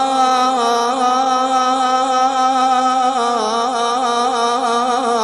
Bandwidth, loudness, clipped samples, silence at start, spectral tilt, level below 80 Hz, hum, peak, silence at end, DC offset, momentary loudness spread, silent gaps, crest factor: 12 kHz; -15 LUFS; under 0.1%; 0 s; -1.5 dB/octave; -58 dBFS; none; -4 dBFS; 0 s; under 0.1%; 3 LU; none; 12 dB